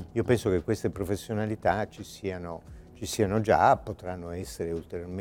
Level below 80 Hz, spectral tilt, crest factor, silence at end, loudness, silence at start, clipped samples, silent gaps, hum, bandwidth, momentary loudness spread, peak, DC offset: -52 dBFS; -6 dB/octave; 20 dB; 0 s; -29 LUFS; 0 s; under 0.1%; none; none; 17.5 kHz; 15 LU; -8 dBFS; under 0.1%